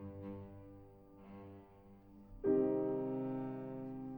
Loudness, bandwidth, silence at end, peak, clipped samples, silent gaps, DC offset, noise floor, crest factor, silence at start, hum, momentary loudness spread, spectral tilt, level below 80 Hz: -39 LUFS; 19 kHz; 0 s; -22 dBFS; under 0.1%; none; under 0.1%; -60 dBFS; 20 dB; 0 s; none; 26 LU; -11 dB/octave; -66 dBFS